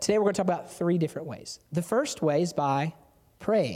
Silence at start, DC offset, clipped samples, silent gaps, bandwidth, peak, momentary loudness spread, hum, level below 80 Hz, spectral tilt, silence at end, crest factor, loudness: 0 s; under 0.1%; under 0.1%; none; 15.5 kHz; -10 dBFS; 11 LU; none; -66 dBFS; -5.5 dB/octave; 0 s; 16 dB; -28 LUFS